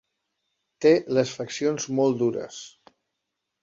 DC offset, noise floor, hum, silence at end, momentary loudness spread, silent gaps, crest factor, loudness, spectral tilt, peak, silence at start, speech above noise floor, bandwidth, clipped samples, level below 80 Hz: under 0.1%; -82 dBFS; none; 0.95 s; 17 LU; none; 18 dB; -24 LUFS; -5 dB/octave; -8 dBFS; 0.8 s; 58 dB; 7.8 kHz; under 0.1%; -70 dBFS